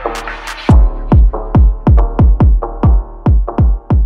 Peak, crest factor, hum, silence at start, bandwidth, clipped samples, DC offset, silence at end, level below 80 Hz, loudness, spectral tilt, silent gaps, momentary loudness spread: 0 dBFS; 10 dB; none; 0 s; 7.8 kHz; under 0.1%; under 0.1%; 0 s; -12 dBFS; -12 LUFS; -8.5 dB/octave; none; 6 LU